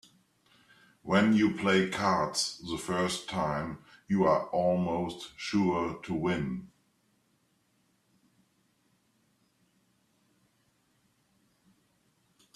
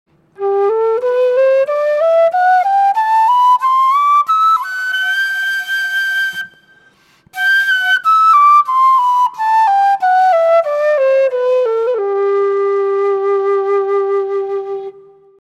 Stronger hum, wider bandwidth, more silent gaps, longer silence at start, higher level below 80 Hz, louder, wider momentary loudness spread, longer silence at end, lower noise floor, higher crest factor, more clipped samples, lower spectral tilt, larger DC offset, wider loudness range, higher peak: neither; second, 13 kHz vs 15.5 kHz; neither; first, 1.05 s vs 0.4 s; first, -64 dBFS vs -72 dBFS; second, -29 LUFS vs -13 LUFS; first, 12 LU vs 7 LU; first, 5.9 s vs 0.5 s; first, -72 dBFS vs -50 dBFS; first, 22 dB vs 10 dB; neither; first, -5 dB/octave vs -2 dB/octave; neither; first, 10 LU vs 5 LU; second, -10 dBFS vs -2 dBFS